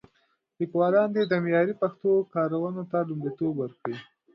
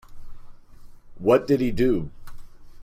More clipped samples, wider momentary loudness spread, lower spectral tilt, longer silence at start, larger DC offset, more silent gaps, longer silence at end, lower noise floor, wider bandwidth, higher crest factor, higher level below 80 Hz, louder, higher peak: neither; first, 11 LU vs 8 LU; first, -9.5 dB/octave vs -7.5 dB/octave; first, 0.6 s vs 0.1 s; neither; neither; first, 0.3 s vs 0 s; first, -71 dBFS vs -43 dBFS; second, 5.8 kHz vs 15.5 kHz; about the same, 16 dB vs 18 dB; second, -74 dBFS vs -40 dBFS; second, -27 LUFS vs -22 LUFS; second, -10 dBFS vs -6 dBFS